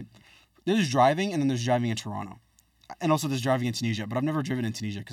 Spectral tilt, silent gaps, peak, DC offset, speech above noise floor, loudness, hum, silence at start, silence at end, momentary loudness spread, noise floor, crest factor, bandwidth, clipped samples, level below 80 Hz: -5.5 dB/octave; none; -10 dBFS; under 0.1%; 31 dB; -27 LUFS; none; 0 s; 0 s; 12 LU; -57 dBFS; 18 dB; 16 kHz; under 0.1%; -66 dBFS